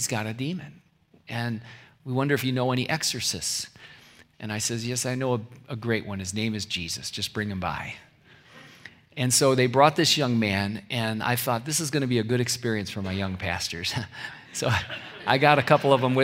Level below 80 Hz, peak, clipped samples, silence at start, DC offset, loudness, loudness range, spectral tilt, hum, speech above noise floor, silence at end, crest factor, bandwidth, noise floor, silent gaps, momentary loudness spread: -62 dBFS; -2 dBFS; under 0.1%; 0 s; under 0.1%; -25 LUFS; 7 LU; -4 dB/octave; none; 28 dB; 0 s; 24 dB; 16 kHz; -54 dBFS; none; 16 LU